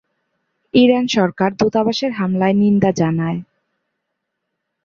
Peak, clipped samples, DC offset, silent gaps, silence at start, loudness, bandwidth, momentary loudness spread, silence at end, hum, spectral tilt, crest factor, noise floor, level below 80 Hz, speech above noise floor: -2 dBFS; under 0.1%; under 0.1%; none; 0.75 s; -16 LUFS; 7.4 kHz; 7 LU; 1.4 s; none; -6.5 dB/octave; 16 dB; -76 dBFS; -54 dBFS; 61 dB